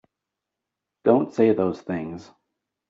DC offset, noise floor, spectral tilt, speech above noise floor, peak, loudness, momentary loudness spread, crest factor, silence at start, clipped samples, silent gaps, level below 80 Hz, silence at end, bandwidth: under 0.1%; -85 dBFS; -7.5 dB/octave; 63 dB; -4 dBFS; -22 LUFS; 14 LU; 20 dB; 1.05 s; under 0.1%; none; -66 dBFS; 0.65 s; 7.6 kHz